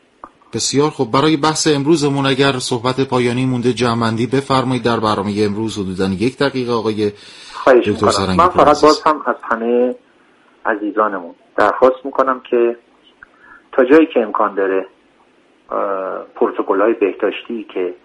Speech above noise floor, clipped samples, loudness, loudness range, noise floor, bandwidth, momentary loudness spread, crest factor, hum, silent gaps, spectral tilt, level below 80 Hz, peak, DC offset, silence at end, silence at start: 37 dB; under 0.1%; -16 LUFS; 4 LU; -53 dBFS; 11.5 kHz; 10 LU; 16 dB; none; none; -5 dB/octave; -50 dBFS; 0 dBFS; under 0.1%; 0.1 s; 0.25 s